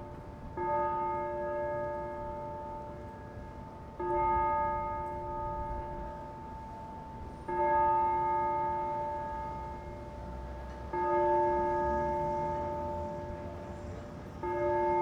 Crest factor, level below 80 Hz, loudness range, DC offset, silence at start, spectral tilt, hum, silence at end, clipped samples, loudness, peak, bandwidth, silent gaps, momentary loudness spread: 16 dB; -48 dBFS; 4 LU; under 0.1%; 0 s; -8 dB/octave; none; 0 s; under 0.1%; -34 LUFS; -18 dBFS; 8.8 kHz; none; 16 LU